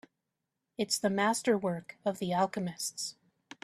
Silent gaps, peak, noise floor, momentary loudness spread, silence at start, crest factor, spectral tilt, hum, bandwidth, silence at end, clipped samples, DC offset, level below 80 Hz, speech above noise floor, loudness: none; -14 dBFS; -86 dBFS; 10 LU; 0.8 s; 18 dB; -4 dB/octave; none; 14 kHz; 0.5 s; under 0.1%; under 0.1%; -74 dBFS; 54 dB; -32 LUFS